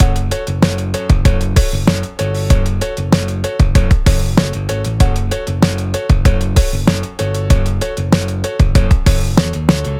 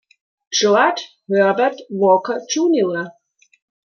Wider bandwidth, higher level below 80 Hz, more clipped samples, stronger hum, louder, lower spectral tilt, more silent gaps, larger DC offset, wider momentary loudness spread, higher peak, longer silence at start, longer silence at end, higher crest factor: first, 16.5 kHz vs 7 kHz; first, -16 dBFS vs -70 dBFS; neither; neither; about the same, -15 LUFS vs -17 LUFS; first, -6 dB/octave vs -3.5 dB/octave; neither; neither; about the same, 6 LU vs 8 LU; about the same, 0 dBFS vs -2 dBFS; second, 0 s vs 0.5 s; second, 0 s vs 0.85 s; about the same, 12 dB vs 16 dB